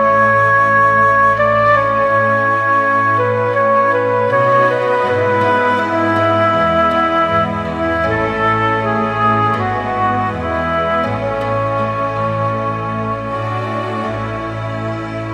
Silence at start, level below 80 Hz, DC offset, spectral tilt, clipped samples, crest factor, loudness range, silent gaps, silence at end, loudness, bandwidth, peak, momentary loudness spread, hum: 0 s; -40 dBFS; under 0.1%; -7 dB/octave; under 0.1%; 12 dB; 6 LU; none; 0 s; -14 LUFS; 10.5 kHz; -2 dBFS; 9 LU; none